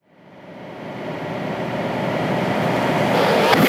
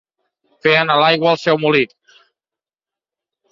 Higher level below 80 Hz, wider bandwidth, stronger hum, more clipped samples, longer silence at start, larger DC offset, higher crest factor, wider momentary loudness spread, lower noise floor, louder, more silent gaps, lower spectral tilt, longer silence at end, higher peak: first, -54 dBFS vs -62 dBFS; first, 18.5 kHz vs 7.6 kHz; neither; neither; second, 0.3 s vs 0.65 s; neither; about the same, 20 dB vs 16 dB; first, 18 LU vs 6 LU; second, -44 dBFS vs -90 dBFS; second, -21 LUFS vs -15 LUFS; neither; about the same, -5.5 dB/octave vs -5.5 dB/octave; second, 0 s vs 1.65 s; about the same, 0 dBFS vs -2 dBFS